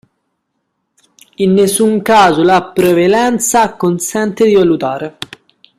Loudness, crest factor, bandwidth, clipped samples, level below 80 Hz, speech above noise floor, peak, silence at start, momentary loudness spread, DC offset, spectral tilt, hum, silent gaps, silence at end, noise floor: -11 LUFS; 12 dB; 15.5 kHz; under 0.1%; -50 dBFS; 58 dB; 0 dBFS; 1.4 s; 10 LU; under 0.1%; -4.5 dB/octave; none; none; 0.55 s; -69 dBFS